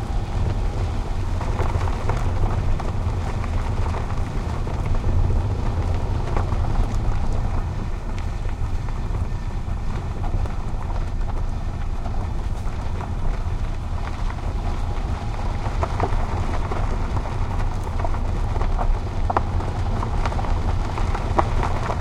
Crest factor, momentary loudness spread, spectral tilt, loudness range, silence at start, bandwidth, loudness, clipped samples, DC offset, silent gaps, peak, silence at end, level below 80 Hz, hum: 20 dB; 5 LU; -7 dB/octave; 4 LU; 0 s; 9.8 kHz; -26 LUFS; under 0.1%; under 0.1%; none; 0 dBFS; 0 s; -24 dBFS; none